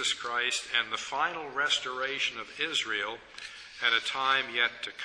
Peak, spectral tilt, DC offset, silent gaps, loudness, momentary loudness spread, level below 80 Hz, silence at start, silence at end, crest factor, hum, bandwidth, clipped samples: -10 dBFS; 0 dB/octave; under 0.1%; none; -29 LUFS; 8 LU; -70 dBFS; 0 s; 0 s; 20 dB; none; 10.5 kHz; under 0.1%